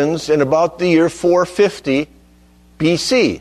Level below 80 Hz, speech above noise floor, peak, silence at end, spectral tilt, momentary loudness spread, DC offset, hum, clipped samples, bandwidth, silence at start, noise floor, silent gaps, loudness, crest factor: -48 dBFS; 33 dB; -2 dBFS; 0 s; -5 dB/octave; 5 LU; under 0.1%; 60 Hz at -45 dBFS; under 0.1%; 13.5 kHz; 0 s; -48 dBFS; none; -15 LUFS; 14 dB